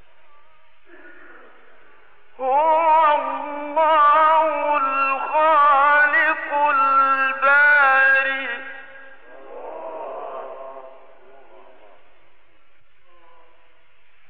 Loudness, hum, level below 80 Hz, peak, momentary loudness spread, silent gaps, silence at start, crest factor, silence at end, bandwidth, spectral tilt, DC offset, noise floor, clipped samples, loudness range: -16 LUFS; none; -72 dBFS; -8 dBFS; 21 LU; none; 2.4 s; 14 dB; 3.4 s; 4.9 kHz; -5.5 dB/octave; 0.9%; -60 dBFS; under 0.1%; 21 LU